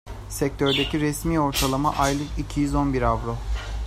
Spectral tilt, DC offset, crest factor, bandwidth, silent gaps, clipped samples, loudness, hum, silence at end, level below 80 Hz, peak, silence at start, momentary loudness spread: -5 dB/octave; under 0.1%; 16 dB; 16 kHz; none; under 0.1%; -24 LUFS; none; 0 s; -32 dBFS; -6 dBFS; 0.05 s; 8 LU